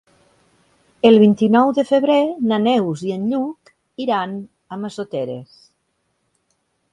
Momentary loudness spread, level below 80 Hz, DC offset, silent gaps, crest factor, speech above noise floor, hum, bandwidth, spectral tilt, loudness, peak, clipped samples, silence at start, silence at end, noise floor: 17 LU; -64 dBFS; under 0.1%; none; 18 dB; 53 dB; none; 9.8 kHz; -7 dB/octave; -17 LUFS; 0 dBFS; under 0.1%; 1.05 s; 1.5 s; -69 dBFS